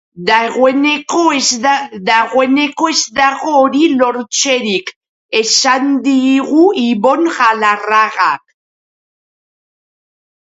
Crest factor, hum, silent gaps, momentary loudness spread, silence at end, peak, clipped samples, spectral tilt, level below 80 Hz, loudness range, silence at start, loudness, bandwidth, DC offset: 14 dB; none; 4.96-5.01 s, 5.09-5.29 s; 4 LU; 2.05 s; 0 dBFS; under 0.1%; -2 dB/octave; -60 dBFS; 3 LU; 0.15 s; -12 LUFS; 8 kHz; under 0.1%